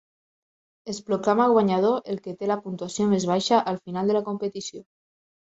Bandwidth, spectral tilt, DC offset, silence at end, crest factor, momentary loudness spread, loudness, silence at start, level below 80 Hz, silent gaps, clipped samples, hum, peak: 8.2 kHz; -5.5 dB/octave; under 0.1%; 0.6 s; 18 dB; 15 LU; -24 LUFS; 0.85 s; -66 dBFS; none; under 0.1%; none; -6 dBFS